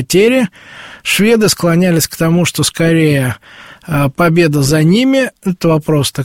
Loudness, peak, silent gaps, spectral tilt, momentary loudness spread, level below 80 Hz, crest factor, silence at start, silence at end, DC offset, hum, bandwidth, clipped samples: -12 LUFS; 0 dBFS; none; -5 dB/octave; 8 LU; -42 dBFS; 12 dB; 0 s; 0 s; 0.4%; none; 16.5 kHz; under 0.1%